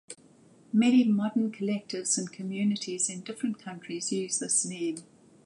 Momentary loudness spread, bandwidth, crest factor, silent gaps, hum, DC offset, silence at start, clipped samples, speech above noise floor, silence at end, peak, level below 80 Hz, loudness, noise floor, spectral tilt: 13 LU; 11.5 kHz; 16 dB; none; none; under 0.1%; 0.1 s; under 0.1%; 29 dB; 0.45 s; -12 dBFS; -80 dBFS; -28 LUFS; -58 dBFS; -4 dB/octave